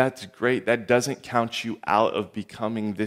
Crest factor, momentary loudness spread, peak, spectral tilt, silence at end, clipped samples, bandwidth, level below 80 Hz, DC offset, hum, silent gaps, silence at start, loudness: 20 dB; 8 LU; -6 dBFS; -5 dB/octave; 0 s; under 0.1%; 16 kHz; -66 dBFS; under 0.1%; none; none; 0 s; -25 LUFS